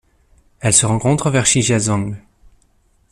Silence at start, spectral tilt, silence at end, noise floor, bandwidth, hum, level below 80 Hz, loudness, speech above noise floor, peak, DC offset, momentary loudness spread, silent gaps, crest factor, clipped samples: 0.6 s; -4 dB/octave; 0.95 s; -57 dBFS; 14.5 kHz; none; -44 dBFS; -15 LUFS; 42 dB; 0 dBFS; under 0.1%; 11 LU; none; 18 dB; under 0.1%